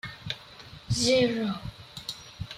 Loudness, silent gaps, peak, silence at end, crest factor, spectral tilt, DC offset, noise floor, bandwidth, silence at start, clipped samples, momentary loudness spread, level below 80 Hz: -28 LUFS; none; -12 dBFS; 0 s; 18 dB; -4 dB/octave; under 0.1%; -48 dBFS; 15.5 kHz; 0.05 s; under 0.1%; 18 LU; -52 dBFS